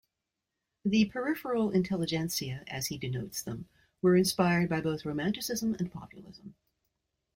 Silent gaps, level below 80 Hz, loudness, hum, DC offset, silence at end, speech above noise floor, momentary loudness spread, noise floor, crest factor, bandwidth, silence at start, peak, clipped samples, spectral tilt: none; -62 dBFS; -31 LUFS; none; under 0.1%; 0.85 s; 56 dB; 13 LU; -87 dBFS; 18 dB; 16 kHz; 0.85 s; -14 dBFS; under 0.1%; -5 dB/octave